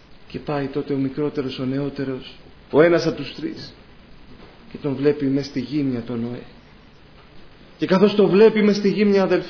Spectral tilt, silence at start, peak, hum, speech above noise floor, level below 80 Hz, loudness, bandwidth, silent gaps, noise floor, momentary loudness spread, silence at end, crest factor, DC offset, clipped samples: -7 dB/octave; 0.1 s; -4 dBFS; none; 27 dB; -52 dBFS; -20 LUFS; 5.4 kHz; none; -47 dBFS; 18 LU; 0 s; 18 dB; under 0.1%; under 0.1%